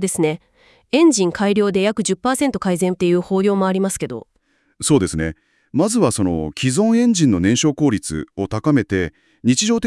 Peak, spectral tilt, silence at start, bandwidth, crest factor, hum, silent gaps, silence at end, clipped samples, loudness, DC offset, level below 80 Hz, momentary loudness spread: -2 dBFS; -5 dB/octave; 0 s; 12 kHz; 16 dB; none; none; 0 s; under 0.1%; -18 LUFS; under 0.1%; -48 dBFS; 10 LU